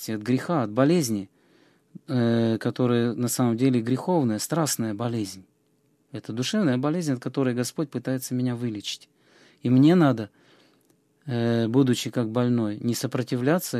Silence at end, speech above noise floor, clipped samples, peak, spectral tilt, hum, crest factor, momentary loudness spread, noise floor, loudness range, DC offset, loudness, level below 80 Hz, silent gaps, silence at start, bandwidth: 0 s; 43 dB; under 0.1%; -6 dBFS; -6 dB/octave; none; 18 dB; 11 LU; -66 dBFS; 4 LU; under 0.1%; -25 LUFS; -68 dBFS; none; 0 s; 14.5 kHz